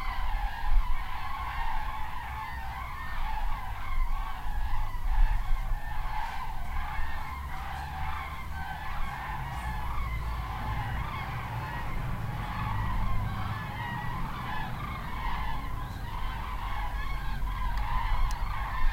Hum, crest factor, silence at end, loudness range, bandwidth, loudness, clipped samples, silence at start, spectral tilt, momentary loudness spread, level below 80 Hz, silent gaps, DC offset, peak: none; 18 dB; 0 s; 2 LU; 16 kHz; -35 LUFS; under 0.1%; 0 s; -5.5 dB/octave; 5 LU; -32 dBFS; none; under 0.1%; -12 dBFS